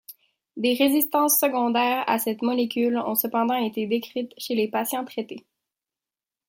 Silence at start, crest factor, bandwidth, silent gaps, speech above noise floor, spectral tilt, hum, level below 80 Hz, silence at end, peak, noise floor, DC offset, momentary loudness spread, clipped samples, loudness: 0.1 s; 18 dB; 16.5 kHz; none; over 66 dB; -3 dB/octave; none; -76 dBFS; 1.1 s; -8 dBFS; under -90 dBFS; under 0.1%; 12 LU; under 0.1%; -23 LUFS